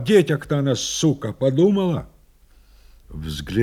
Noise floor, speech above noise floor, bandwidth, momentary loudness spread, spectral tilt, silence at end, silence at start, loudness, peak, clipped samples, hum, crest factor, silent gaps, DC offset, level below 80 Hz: -52 dBFS; 33 dB; 15.5 kHz; 14 LU; -5.5 dB/octave; 0 s; 0 s; -21 LUFS; -2 dBFS; under 0.1%; none; 18 dB; none; under 0.1%; -44 dBFS